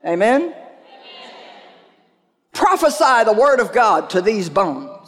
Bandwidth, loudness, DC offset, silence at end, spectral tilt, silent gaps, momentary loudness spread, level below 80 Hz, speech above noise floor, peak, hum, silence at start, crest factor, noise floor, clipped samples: 16 kHz; -15 LUFS; under 0.1%; 0.1 s; -4 dB/octave; none; 18 LU; -58 dBFS; 47 dB; -4 dBFS; none; 0.05 s; 14 dB; -62 dBFS; under 0.1%